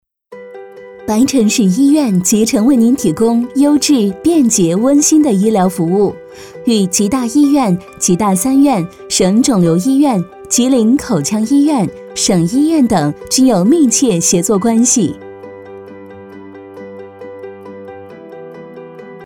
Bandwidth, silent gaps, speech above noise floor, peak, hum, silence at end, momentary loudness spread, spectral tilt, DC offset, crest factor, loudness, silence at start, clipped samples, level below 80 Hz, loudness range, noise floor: 17.5 kHz; none; 24 dB; -2 dBFS; none; 0 s; 22 LU; -5 dB/octave; under 0.1%; 10 dB; -12 LUFS; 0.3 s; under 0.1%; -46 dBFS; 7 LU; -35 dBFS